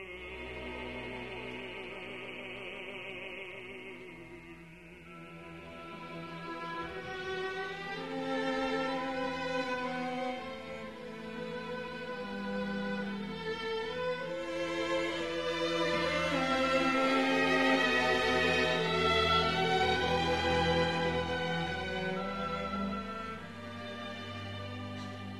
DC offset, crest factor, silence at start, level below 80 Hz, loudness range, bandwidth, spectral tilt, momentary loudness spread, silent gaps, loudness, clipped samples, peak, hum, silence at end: 0.1%; 18 dB; 0 s; -56 dBFS; 15 LU; 13 kHz; -4.5 dB/octave; 16 LU; none; -33 LUFS; under 0.1%; -16 dBFS; none; 0 s